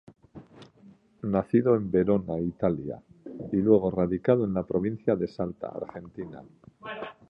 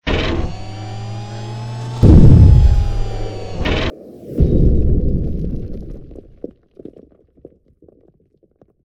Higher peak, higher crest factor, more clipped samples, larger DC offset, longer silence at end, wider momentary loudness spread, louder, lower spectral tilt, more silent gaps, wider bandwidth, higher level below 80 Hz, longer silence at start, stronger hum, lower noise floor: second, -8 dBFS vs 0 dBFS; first, 20 dB vs 14 dB; second, under 0.1% vs 0.4%; neither; second, 0.15 s vs 2.65 s; second, 18 LU vs 26 LU; second, -27 LUFS vs -15 LUFS; first, -10.5 dB/octave vs -8 dB/octave; neither; second, 5.4 kHz vs 8.2 kHz; second, -54 dBFS vs -18 dBFS; first, 0.35 s vs 0.05 s; neither; about the same, -56 dBFS vs -57 dBFS